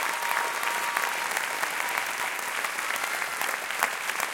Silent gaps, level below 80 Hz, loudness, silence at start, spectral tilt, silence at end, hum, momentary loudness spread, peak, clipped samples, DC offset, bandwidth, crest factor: none; -74 dBFS; -28 LUFS; 0 s; 1 dB/octave; 0 s; none; 2 LU; -4 dBFS; under 0.1%; under 0.1%; 17 kHz; 24 dB